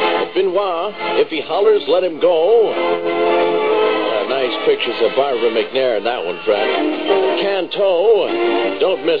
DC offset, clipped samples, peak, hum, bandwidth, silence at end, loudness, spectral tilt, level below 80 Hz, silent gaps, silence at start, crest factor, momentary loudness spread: 0.9%; under 0.1%; 0 dBFS; none; 5.2 kHz; 0 s; -16 LUFS; -6.5 dB/octave; -60 dBFS; none; 0 s; 14 dB; 5 LU